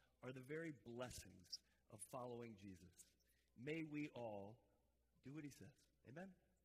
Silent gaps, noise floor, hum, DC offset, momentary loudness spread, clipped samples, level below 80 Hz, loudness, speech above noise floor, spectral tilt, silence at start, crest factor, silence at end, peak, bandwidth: none; -83 dBFS; none; under 0.1%; 14 LU; under 0.1%; -80 dBFS; -55 LUFS; 28 dB; -5 dB/octave; 0 s; 20 dB; 0.3 s; -38 dBFS; 15.5 kHz